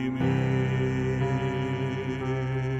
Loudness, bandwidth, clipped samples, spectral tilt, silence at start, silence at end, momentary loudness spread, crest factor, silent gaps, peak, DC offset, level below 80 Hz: -28 LUFS; 8 kHz; under 0.1%; -8 dB/octave; 0 s; 0 s; 4 LU; 12 dB; none; -14 dBFS; under 0.1%; -46 dBFS